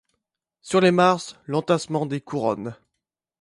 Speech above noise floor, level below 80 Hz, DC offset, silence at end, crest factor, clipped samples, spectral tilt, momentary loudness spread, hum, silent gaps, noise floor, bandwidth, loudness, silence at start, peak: 61 dB; -64 dBFS; under 0.1%; 0.65 s; 20 dB; under 0.1%; -5.5 dB/octave; 10 LU; none; none; -83 dBFS; 11.5 kHz; -22 LUFS; 0.65 s; -4 dBFS